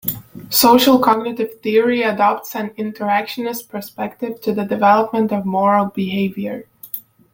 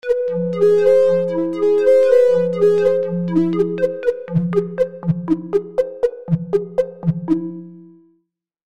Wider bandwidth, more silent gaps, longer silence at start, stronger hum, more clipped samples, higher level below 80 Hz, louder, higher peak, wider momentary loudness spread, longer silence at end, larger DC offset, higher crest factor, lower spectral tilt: first, 17 kHz vs 8.4 kHz; neither; about the same, 0.05 s vs 0.05 s; neither; neither; about the same, -58 dBFS vs -56 dBFS; about the same, -17 LUFS vs -17 LUFS; about the same, -2 dBFS vs -4 dBFS; first, 16 LU vs 10 LU; second, 0.35 s vs 0.75 s; second, under 0.1% vs 0.4%; about the same, 16 dB vs 14 dB; second, -4.5 dB/octave vs -9 dB/octave